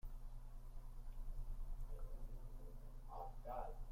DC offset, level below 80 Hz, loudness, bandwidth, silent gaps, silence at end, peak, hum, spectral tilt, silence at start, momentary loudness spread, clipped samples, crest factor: under 0.1%; -48 dBFS; -56 LUFS; 15 kHz; none; 0 s; -36 dBFS; none; -7 dB/octave; 0.05 s; 9 LU; under 0.1%; 12 dB